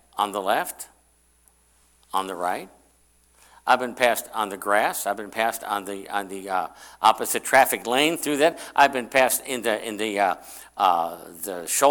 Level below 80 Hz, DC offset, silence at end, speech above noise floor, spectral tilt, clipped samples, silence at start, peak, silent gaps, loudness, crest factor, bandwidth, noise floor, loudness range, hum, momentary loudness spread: -64 dBFS; under 0.1%; 0 s; 38 dB; -2 dB/octave; under 0.1%; 0.15 s; -4 dBFS; none; -23 LUFS; 20 dB; 19 kHz; -61 dBFS; 8 LU; none; 12 LU